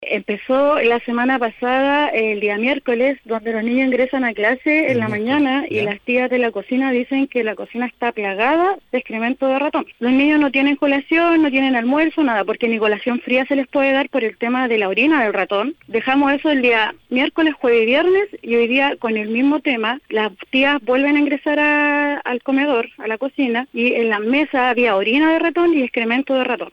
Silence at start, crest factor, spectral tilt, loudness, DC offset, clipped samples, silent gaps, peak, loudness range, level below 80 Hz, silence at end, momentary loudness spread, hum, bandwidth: 0 s; 14 dB; -6.5 dB/octave; -17 LUFS; under 0.1%; under 0.1%; none; -4 dBFS; 3 LU; -58 dBFS; 0.05 s; 6 LU; none; 5.8 kHz